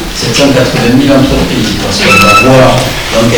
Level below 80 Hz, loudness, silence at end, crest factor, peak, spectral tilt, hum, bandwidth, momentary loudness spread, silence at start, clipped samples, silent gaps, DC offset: -22 dBFS; -6 LUFS; 0 s; 6 dB; 0 dBFS; -4.5 dB/octave; none; over 20 kHz; 8 LU; 0 s; 5%; none; under 0.1%